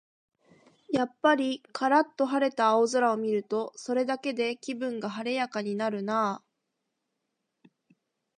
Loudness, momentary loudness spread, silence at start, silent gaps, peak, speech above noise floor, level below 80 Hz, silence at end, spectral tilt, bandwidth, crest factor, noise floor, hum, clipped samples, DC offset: -28 LUFS; 9 LU; 0.9 s; none; -10 dBFS; 54 dB; -78 dBFS; 2 s; -4.5 dB/octave; 10.5 kHz; 20 dB; -82 dBFS; none; under 0.1%; under 0.1%